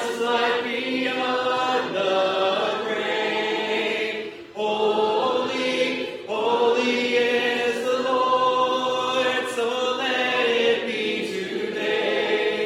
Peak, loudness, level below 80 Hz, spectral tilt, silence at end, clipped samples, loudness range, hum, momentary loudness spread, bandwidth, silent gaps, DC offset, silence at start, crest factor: -10 dBFS; -23 LUFS; -72 dBFS; -3 dB/octave; 0 s; under 0.1%; 2 LU; none; 6 LU; 14.5 kHz; none; under 0.1%; 0 s; 14 dB